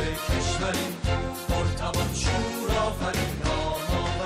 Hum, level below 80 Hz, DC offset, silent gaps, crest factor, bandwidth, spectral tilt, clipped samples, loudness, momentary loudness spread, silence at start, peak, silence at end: none; -34 dBFS; under 0.1%; none; 12 dB; 16 kHz; -4.5 dB/octave; under 0.1%; -27 LUFS; 2 LU; 0 s; -14 dBFS; 0 s